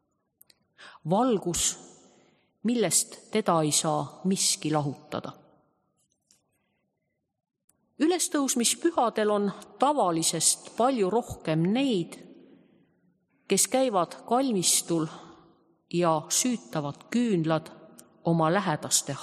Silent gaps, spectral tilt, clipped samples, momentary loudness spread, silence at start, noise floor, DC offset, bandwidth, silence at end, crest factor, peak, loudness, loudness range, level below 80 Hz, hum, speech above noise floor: 7.64-7.68 s; -3.5 dB/octave; under 0.1%; 10 LU; 0.8 s; -79 dBFS; under 0.1%; 14.5 kHz; 0 s; 20 dB; -8 dBFS; -26 LUFS; 6 LU; -64 dBFS; none; 53 dB